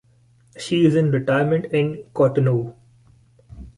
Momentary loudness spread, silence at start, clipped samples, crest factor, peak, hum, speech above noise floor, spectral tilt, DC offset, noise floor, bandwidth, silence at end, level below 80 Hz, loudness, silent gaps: 8 LU; 0.55 s; under 0.1%; 16 dB; -6 dBFS; none; 37 dB; -7.5 dB/octave; under 0.1%; -56 dBFS; 11.5 kHz; 0.1 s; -52 dBFS; -20 LUFS; none